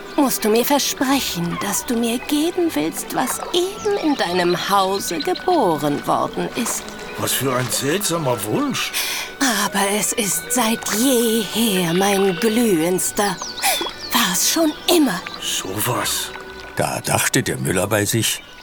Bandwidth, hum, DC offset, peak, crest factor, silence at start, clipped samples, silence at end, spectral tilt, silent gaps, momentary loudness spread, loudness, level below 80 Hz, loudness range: over 20 kHz; none; under 0.1%; 0 dBFS; 20 dB; 0 s; under 0.1%; 0 s; -3 dB/octave; none; 6 LU; -19 LUFS; -48 dBFS; 3 LU